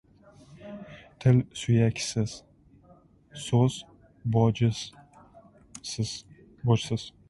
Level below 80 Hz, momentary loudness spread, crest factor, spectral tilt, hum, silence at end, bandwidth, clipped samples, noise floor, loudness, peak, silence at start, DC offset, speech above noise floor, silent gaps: -56 dBFS; 21 LU; 20 dB; -6 dB/octave; none; 0.2 s; 11.5 kHz; under 0.1%; -58 dBFS; -27 LUFS; -8 dBFS; 0.5 s; under 0.1%; 32 dB; none